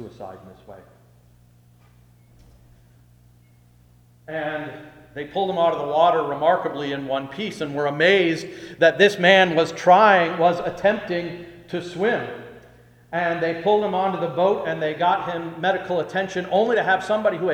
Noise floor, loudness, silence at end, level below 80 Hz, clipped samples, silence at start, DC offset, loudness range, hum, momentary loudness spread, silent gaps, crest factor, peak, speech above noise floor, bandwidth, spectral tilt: -54 dBFS; -20 LUFS; 0 s; -60 dBFS; under 0.1%; 0 s; under 0.1%; 11 LU; 60 Hz at -50 dBFS; 16 LU; none; 20 dB; -2 dBFS; 33 dB; 13 kHz; -5 dB/octave